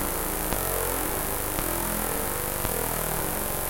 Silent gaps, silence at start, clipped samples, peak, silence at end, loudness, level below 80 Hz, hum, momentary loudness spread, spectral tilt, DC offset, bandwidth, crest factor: none; 0 s; under 0.1%; -6 dBFS; 0 s; -27 LUFS; -36 dBFS; none; 1 LU; -3 dB/octave; under 0.1%; 17.5 kHz; 22 dB